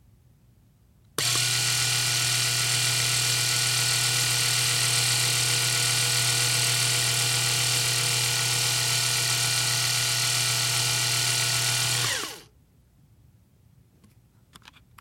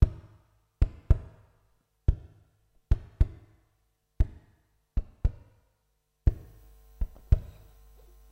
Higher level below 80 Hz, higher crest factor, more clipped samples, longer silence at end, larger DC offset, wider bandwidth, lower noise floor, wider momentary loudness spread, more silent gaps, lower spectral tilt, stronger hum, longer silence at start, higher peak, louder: second, -58 dBFS vs -32 dBFS; second, 18 dB vs 24 dB; neither; first, 2.6 s vs 0.85 s; neither; first, 16.5 kHz vs 4.9 kHz; second, -59 dBFS vs -75 dBFS; second, 1 LU vs 12 LU; neither; second, -0.5 dB/octave vs -9 dB/octave; neither; first, 1.2 s vs 0 s; about the same, -8 dBFS vs -8 dBFS; first, -22 LUFS vs -32 LUFS